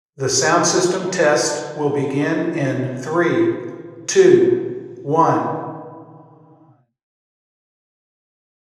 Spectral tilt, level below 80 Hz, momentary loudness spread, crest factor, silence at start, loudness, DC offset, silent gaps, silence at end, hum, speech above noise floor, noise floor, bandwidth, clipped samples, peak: -4.5 dB/octave; -68 dBFS; 15 LU; 20 dB; 0.2 s; -18 LUFS; under 0.1%; none; 2.55 s; none; 36 dB; -53 dBFS; 12.5 kHz; under 0.1%; 0 dBFS